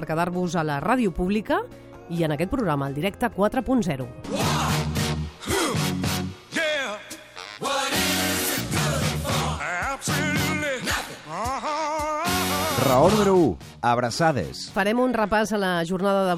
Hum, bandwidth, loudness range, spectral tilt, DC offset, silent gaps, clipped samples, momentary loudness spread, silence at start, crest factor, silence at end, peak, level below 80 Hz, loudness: none; 16.5 kHz; 4 LU; -4.5 dB/octave; under 0.1%; none; under 0.1%; 8 LU; 0 s; 18 dB; 0 s; -6 dBFS; -44 dBFS; -24 LUFS